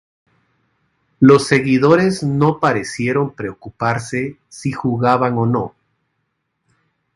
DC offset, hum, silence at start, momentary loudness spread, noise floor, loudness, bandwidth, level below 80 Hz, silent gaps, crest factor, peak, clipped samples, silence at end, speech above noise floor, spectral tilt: under 0.1%; none; 1.2 s; 14 LU; -71 dBFS; -16 LUFS; 11.5 kHz; -52 dBFS; none; 18 dB; 0 dBFS; under 0.1%; 1.45 s; 56 dB; -6.5 dB/octave